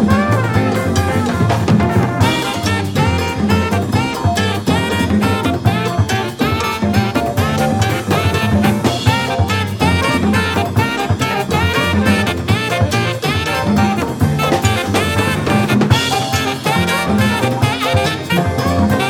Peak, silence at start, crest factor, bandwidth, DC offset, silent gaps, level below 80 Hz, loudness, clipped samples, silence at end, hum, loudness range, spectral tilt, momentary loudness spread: 0 dBFS; 0 s; 14 dB; 18 kHz; under 0.1%; none; -34 dBFS; -15 LUFS; under 0.1%; 0 s; none; 1 LU; -5.5 dB/octave; 3 LU